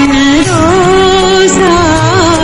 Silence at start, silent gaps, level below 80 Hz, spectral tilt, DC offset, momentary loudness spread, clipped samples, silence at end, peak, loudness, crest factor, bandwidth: 0 s; none; -26 dBFS; -4.5 dB/octave; under 0.1%; 1 LU; 0.8%; 0 s; 0 dBFS; -7 LUFS; 6 dB; 11 kHz